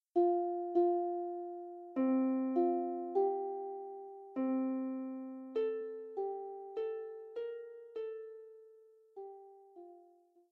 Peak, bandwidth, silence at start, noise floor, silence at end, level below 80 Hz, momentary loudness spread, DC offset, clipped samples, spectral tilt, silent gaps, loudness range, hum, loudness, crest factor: -22 dBFS; 4.3 kHz; 0.15 s; -66 dBFS; 0.5 s; under -90 dBFS; 20 LU; under 0.1%; under 0.1%; -5.5 dB/octave; none; 11 LU; none; -37 LUFS; 16 dB